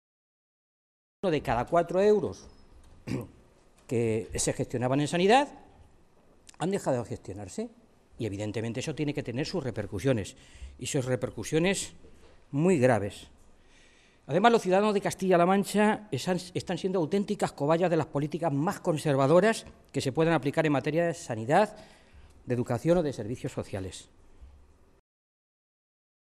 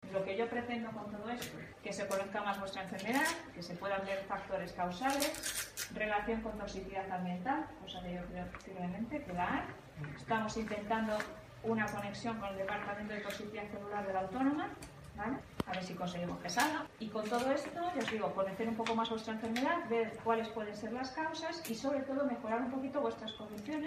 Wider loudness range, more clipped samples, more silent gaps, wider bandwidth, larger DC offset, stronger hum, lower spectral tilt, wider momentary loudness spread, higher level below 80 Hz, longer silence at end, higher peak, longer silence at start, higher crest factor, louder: first, 7 LU vs 3 LU; neither; neither; second, 13.5 kHz vs 15.5 kHz; neither; neither; about the same, -5.5 dB/octave vs -4.5 dB/octave; first, 14 LU vs 9 LU; first, -56 dBFS vs -62 dBFS; first, 1.9 s vs 0 s; first, -8 dBFS vs -16 dBFS; first, 1.25 s vs 0 s; about the same, 20 dB vs 22 dB; first, -28 LUFS vs -38 LUFS